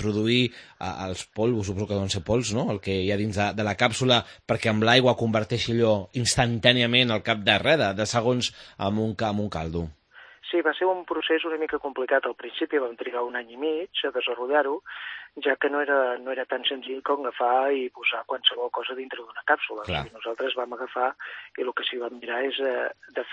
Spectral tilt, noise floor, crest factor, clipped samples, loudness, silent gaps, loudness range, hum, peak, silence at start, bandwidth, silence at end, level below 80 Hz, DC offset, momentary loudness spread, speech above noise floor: -4.5 dB/octave; -48 dBFS; 24 dB; under 0.1%; -25 LUFS; none; 6 LU; none; -2 dBFS; 0 s; 10.5 kHz; 0 s; -54 dBFS; under 0.1%; 12 LU; 22 dB